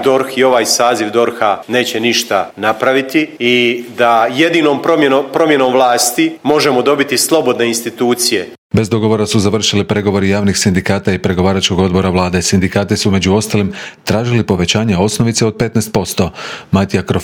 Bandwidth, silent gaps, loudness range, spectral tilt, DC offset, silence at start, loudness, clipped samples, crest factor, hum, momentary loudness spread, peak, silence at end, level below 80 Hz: 19.5 kHz; 8.58-8.70 s; 2 LU; -4.5 dB/octave; under 0.1%; 0 s; -13 LUFS; under 0.1%; 12 dB; none; 5 LU; 0 dBFS; 0 s; -46 dBFS